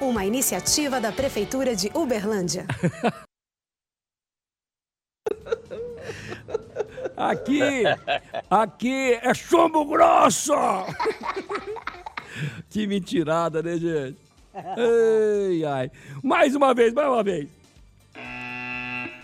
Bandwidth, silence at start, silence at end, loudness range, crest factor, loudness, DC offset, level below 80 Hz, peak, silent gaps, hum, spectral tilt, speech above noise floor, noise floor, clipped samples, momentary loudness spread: 16 kHz; 0 s; 0 s; 11 LU; 18 dB; -23 LUFS; under 0.1%; -54 dBFS; -6 dBFS; none; none; -4 dB/octave; over 68 dB; under -90 dBFS; under 0.1%; 16 LU